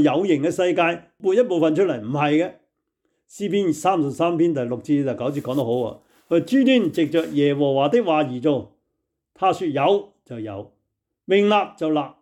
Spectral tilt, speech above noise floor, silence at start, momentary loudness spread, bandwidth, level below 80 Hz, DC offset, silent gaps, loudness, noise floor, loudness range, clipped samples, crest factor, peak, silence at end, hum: -6.5 dB/octave; 57 dB; 0 s; 8 LU; 14 kHz; -68 dBFS; under 0.1%; none; -21 LUFS; -77 dBFS; 3 LU; under 0.1%; 14 dB; -6 dBFS; 0.1 s; none